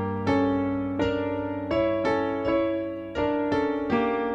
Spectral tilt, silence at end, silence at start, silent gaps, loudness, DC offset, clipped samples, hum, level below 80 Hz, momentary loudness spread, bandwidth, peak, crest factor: -7.5 dB/octave; 0 s; 0 s; none; -26 LUFS; under 0.1%; under 0.1%; none; -50 dBFS; 5 LU; 7.4 kHz; -10 dBFS; 16 dB